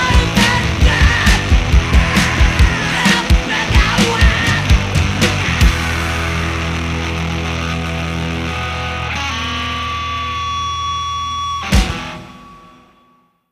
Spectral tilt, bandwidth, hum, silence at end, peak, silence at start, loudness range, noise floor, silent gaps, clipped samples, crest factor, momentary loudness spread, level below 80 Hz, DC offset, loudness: -4.5 dB/octave; 15.5 kHz; none; 0.95 s; 0 dBFS; 0 s; 7 LU; -55 dBFS; none; under 0.1%; 16 dB; 8 LU; -18 dBFS; under 0.1%; -15 LUFS